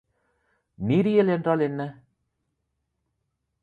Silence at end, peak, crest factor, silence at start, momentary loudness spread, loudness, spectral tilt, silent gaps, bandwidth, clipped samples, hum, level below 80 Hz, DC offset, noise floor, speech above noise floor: 1.7 s; -8 dBFS; 18 dB; 0.8 s; 13 LU; -24 LUFS; -9.5 dB/octave; none; 4.8 kHz; under 0.1%; none; -62 dBFS; under 0.1%; -78 dBFS; 55 dB